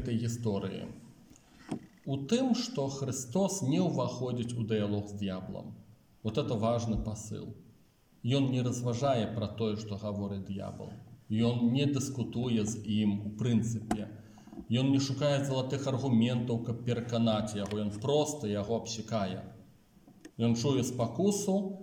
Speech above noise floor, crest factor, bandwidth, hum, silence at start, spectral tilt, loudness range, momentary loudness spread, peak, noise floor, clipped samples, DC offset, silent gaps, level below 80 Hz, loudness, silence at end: 32 dB; 18 dB; 17 kHz; none; 0 s; -6 dB/octave; 3 LU; 14 LU; -14 dBFS; -64 dBFS; under 0.1%; under 0.1%; none; -58 dBFS; -32 LUFS; 0 s